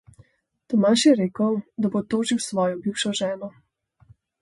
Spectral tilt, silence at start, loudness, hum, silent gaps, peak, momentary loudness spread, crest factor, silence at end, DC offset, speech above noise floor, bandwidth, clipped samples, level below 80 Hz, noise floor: -4.5 dB/octave; 0.7 s; -22 LUFS; none; none; -6 dBFS; 9 LU; 18 dB; 0.9 s; under 0.1%; 37 dB; 11.5 kHz; under 0.1%; -64 dBFS; -59 dBFS